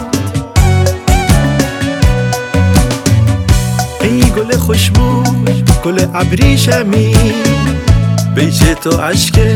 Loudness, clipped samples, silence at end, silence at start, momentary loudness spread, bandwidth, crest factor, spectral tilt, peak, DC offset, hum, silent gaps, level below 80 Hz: -11 LUFS; 1%; 0 s; 0 s; 4 LU; 17.5 kHz; 10 dB; -5.5 dB/octave; 0 dBFS; under 0.1%; none; none; -18 dBFS